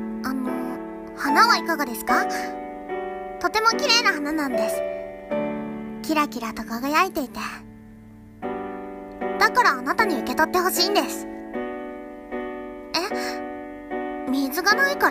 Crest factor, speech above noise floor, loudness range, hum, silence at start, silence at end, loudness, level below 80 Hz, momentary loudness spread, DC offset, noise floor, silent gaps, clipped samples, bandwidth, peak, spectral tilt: 20 dB; 23 dB; 5 LU; none; 0 s; 0 s; -23 LUFS; -54 dBFS; 16 LU; under 0.1%; -45 dBFS; none; under 0.1%; 15.5 kHz; -4 dBFS; -2.5 dB/octave